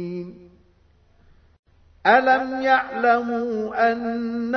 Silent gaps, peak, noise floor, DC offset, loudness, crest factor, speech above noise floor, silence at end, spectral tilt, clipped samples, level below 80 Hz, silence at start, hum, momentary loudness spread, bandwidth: 1.59-1.63 s; -2 dBFS; -57 dBFS; under 0.1%; -21 LUFS; 20 dB; 37 dB; 0 s; -6.5 dB/octave; under 0.1%; -58 dBFS; 0 s; none; 11 LU; 6.4 kHz